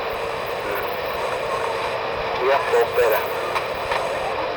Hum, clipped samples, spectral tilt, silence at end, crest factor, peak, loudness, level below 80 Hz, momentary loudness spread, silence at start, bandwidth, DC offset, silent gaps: none; under 0.1%; -3.5 dB/octave; 0 s; 16 dB; -6 dBFS; -22 LUFS; -48 dBFS; 7 LU; 0 s; over 20 kHz; under 0.1%; none